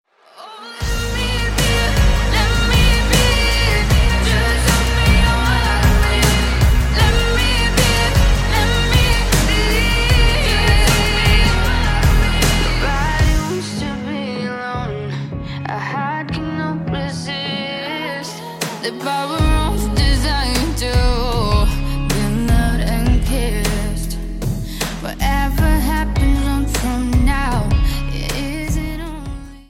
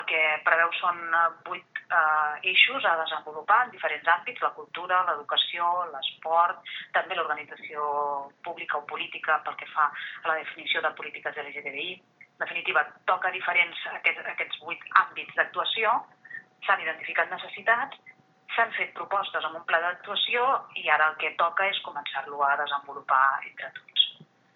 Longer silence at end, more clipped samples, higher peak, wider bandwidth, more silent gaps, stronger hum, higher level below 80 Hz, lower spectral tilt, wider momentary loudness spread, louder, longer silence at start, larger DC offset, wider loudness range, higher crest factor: second, 0.1 s vs 0.3 s; neither; about the same, 0 dBFS vs -2 dBFS; first, 16.5 kHz vs 6.2 kHz; neither; neither; first, -18 dBFS vs under -90 dBFS; about the same, -4.5 dB/octave vs -4 dB/octave; about the same, 9 LU vs 11 LU; first, -17 LUFS vs -26 LUFS; first, 0.4 s vs 0 s; neither; first, 8 LU vs 5 LU; second, 14 dB vs 26 dB